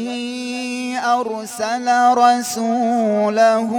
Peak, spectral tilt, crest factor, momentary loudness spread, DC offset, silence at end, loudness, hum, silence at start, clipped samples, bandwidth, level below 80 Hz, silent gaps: -2 dBFS; -3.5 dB/octave; 14 dB; 11 LU; under 0.1%; 0 s; -18 LUFS; none; 0 s; under 0.1%; 17.5 kHz; -68 dBFS; none